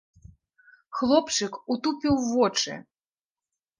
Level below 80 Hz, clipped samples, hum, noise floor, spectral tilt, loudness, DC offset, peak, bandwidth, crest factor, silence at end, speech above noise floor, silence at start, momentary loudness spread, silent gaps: -56 dBFS; under 0.1%; none; under -90 dBFS; -3.5 dB/octave; -25 LUFS; under 0.1%; -8 dBFS; 10.5 kHz; 20 dB; 1 s; over 65 dB; 0.9 s; 9 LU; none